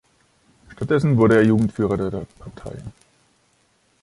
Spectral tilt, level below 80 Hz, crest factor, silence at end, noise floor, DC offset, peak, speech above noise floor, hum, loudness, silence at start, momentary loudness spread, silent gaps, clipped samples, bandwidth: -8.5 dB/octave; -48 dBFS; 18 dB; 1.1 s; -63 dBFS; under 0.1%; -4 dBFS; 44 dB; none; -18 LUFS; 0.7 s; 23 LU; none; under 0.1%; 11.5 kHz